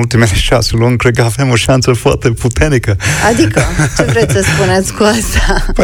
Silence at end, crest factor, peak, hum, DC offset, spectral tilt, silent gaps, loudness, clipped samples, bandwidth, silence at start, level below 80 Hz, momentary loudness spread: 0 s; 10 dB; 0 dBFS; none; under 0.1%; -5 dB/octave; none; -11 LUFS; under 0.1%; 17.5 kHz; 0 s; -20 dBFS; 3 LU